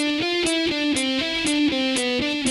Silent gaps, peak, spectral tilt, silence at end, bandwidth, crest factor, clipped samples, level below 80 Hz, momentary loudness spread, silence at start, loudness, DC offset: none; -8 dBFS; -2.5 dB/octave; 0 s; 12.5 kHz; 14 dB; under 0.1%; -50 dBFS; 2 LU; 0 s; -21 LUFS; under 0.1%